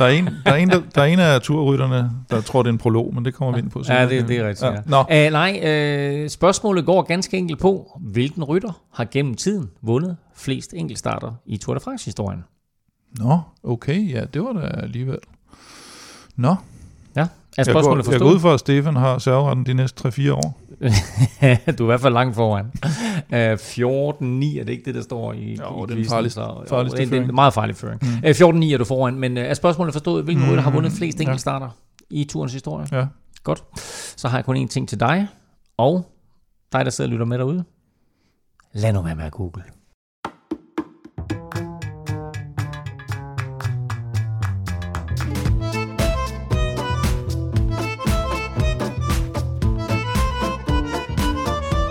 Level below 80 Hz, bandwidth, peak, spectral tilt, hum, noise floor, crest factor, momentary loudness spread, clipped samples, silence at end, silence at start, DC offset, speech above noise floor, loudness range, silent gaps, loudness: -34 dBFS; 15.5 kHz; 0 dBFS; -6.5 dB/octave; none; -68 dBFS; 20 dB; 14 LU; under 0.1%; 0 s; 0 s; under 0.1%; 49 dB; 10 LU; 39.94-40.23 s; -20 LUFS